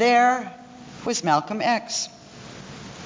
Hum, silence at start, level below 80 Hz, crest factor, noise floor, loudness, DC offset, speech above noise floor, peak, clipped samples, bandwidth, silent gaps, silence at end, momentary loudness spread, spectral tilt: none; 0 s; -62 dBFS; 16 dB; -42 dBFS; -23 LUFS; under 0.1%; 20 dB; -6 dBFS; under 0.1%; 7.6 kHz; none; 0 s; 22 LU; -3 dB/octave